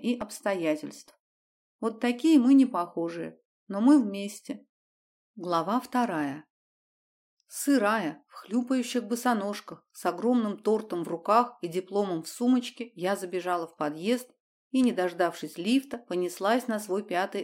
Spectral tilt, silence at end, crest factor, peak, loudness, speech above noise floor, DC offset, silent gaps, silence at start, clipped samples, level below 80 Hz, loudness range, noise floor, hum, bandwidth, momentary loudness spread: -5 dB/octave; 0 s; 20 dB; -8 dBFS; -28 LUFS; over 63 dB; under 0.1%; 1.20-1.79 s, 3.45-3.67 s, 4.69-5.34 s, 6.50-7.37 s, 14.40-14.71 s; 0 s; under 0.1%; -78 dBFS; 5 LU; under -90 dBFS; none; 16.5 kHz; 14 LU